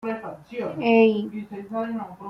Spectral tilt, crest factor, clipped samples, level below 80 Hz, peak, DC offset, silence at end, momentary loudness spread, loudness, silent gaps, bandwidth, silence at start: -8 dB/octave; 18 dB; under 0.1%; -66 dBFS; -6 dBFS; under 0.1%; 0 s; 16 LU; -24 LUFS; none; 6 kHz; 0 s